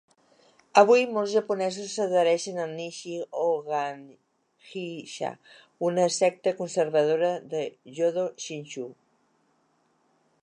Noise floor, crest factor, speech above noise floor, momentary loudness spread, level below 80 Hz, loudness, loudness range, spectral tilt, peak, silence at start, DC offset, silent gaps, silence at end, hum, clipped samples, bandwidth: -69 dBFS; 24 dB; 43 dB; 15 LU; -84 dBFS; -26 LUFS; 7 LU; -4 dB/octave; -4 dBFS; 0.75 s; under 0.1%; none; 1.5 s; none; under 0.1%; 10.5 kHz